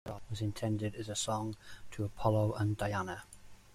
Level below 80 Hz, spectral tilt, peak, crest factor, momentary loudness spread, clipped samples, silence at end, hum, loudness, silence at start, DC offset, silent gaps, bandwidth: -58 dBFS; -5.5 dB/octave; -18 dBFS; 18 dB; 15 LU; under 0.1%; 0 s; none; -36 LUFS; 0.05 s; under 0.1%; none; 14.5 kHz